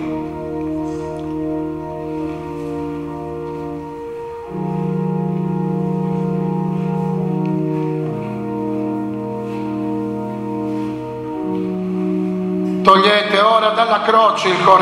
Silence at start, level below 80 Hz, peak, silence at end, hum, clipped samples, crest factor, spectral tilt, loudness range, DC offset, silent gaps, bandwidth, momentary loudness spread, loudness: 0 s; -48 dBFS; 0 dBFS; 0 s; none; under 0.1%; 18 dB; -6.5 dB/octave; 10 LU; under 0.1%; none; 11.5 kHz; 13 LU; -19 LUFS